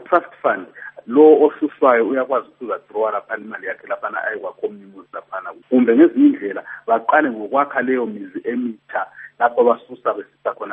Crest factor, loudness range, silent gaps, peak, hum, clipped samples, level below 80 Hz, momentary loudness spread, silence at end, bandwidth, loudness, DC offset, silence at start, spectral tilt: 18 dB; 7 LU; none; 0 dBFS; none; under 0.1%; -72 dBFS; 16 LU; 0 s; 3.8 kHz; -18 LUFS; under 0.1%; 0 s; -4 dB/octave